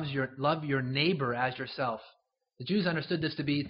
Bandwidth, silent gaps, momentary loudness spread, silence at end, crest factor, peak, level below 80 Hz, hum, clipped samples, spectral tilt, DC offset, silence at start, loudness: 5.6 kHz; none; 6 LU; 0 s; 18 dB; -14 dBFS; -66 dBFS; none; under 0.1%; -4 dB/octave; under 0.1%; 0 s; -31 LUFS